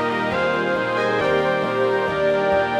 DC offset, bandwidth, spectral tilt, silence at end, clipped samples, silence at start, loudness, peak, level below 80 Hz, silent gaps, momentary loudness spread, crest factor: under 0.1%; 12 kHz; -6 dB/octave; 0 s; under 0.1%; 0 s; -20 LUFS; -8 dBFS; -52 dBFS; none; 2 LU; 12 dB